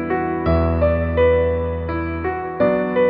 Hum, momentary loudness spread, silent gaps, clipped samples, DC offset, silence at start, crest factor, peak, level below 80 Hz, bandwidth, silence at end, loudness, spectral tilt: none; 8 LU; none; under 0.1%; under 0.1%; 0 s; 12 dB; -6 dBFS; -30 dBFS; 5 kHz; 0 s; -19 LUFS; -11 dB/octave